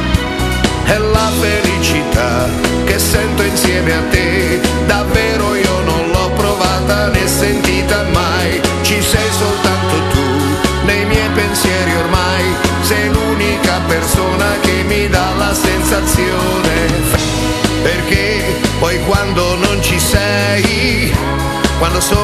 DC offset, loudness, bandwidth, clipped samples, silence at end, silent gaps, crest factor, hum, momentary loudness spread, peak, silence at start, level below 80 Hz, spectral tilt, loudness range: under 0.1%; -13 LUFS; 14.5 kHz; under 0.1%; 0 s; none; 12 dB; none; 2 LU; 0 dBFS; 0 s; -22 dBFS; -4.5 dB/octave; 0 LU